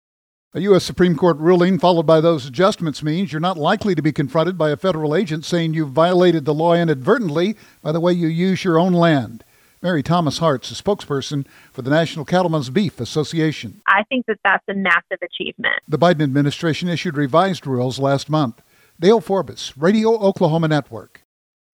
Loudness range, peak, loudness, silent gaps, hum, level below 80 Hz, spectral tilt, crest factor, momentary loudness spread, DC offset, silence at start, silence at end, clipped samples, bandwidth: 3 LU; 0 dBFS; -18 LUFS; none; none; -54 dBFS; -6.5 dB/octave; 16 dB; 8 LU; under 0.1%; 0.55 s; 0.7 s; under 0.1%; 15.5 kHz